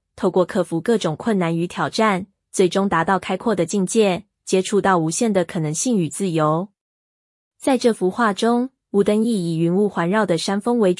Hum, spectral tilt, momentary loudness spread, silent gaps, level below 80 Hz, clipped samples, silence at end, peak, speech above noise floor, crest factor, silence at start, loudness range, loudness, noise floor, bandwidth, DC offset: none; -5 dB/octave; 5 LU; 6.81-7.51 s; -60 dBFS; under 0.1%; 0.05 s; -4 dBFS; over 71 dB; 14 dB; 0.15 s; 2 LU; -20 LUFS; under -90 dBFS; 12 kHz; under 0.1%